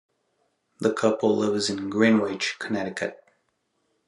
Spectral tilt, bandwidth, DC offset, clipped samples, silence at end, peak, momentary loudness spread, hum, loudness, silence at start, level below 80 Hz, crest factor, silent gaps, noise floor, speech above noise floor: -4.5 dB/octave; 11 kHz; under 0.1%; under 0.1%; 0.9 s; -6 dBFS; 9 LU; none; -24 LUFS; 0.8 s; -76 dBFS; 20 dB; none; -73 dBFS; 49 dB